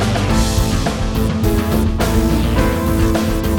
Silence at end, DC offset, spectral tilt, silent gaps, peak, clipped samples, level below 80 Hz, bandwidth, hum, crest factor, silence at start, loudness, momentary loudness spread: 0 s; under 0.1%; -6 dB/octave; none; -2 dBFS; under 0.1%; -20 dBFS; over 20 kHz; none; 14 dB; 0 s; -17 LUFS; 3 LU